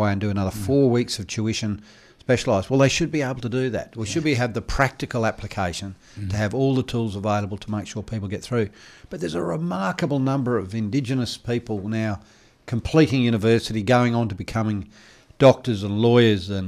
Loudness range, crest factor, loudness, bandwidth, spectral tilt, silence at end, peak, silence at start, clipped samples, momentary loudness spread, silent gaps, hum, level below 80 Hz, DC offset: 5 LU; 18 dB; -23 LUFS; 14.5 kHz; -6 dB/octave; 0 s; -4 dBFS; 0 s; under 0.1%; 11 LU; none; none; -44 dBFS; under 0.1%